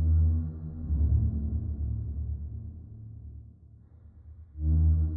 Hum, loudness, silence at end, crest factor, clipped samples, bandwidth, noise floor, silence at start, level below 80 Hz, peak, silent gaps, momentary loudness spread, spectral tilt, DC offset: none; -30 LUFS; 0 s; 12 dB; under 0.1%; 1.4 kHz; -53 dBFS; 0 s; -34 dBFS; -16 dBFS; none; 22 LU; -14.5 dB/octave; under 0.1%